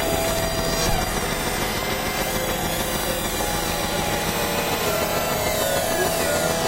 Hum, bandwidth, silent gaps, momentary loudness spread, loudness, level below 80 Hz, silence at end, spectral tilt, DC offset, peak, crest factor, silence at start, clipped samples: none; 16 kHz; none; 2 LU; -22 LUFS; -34 dBFS; 0 s; -3 dB/octave; under 0.1%; -8 dBFS; 14 dB; 0 s; under 0.1%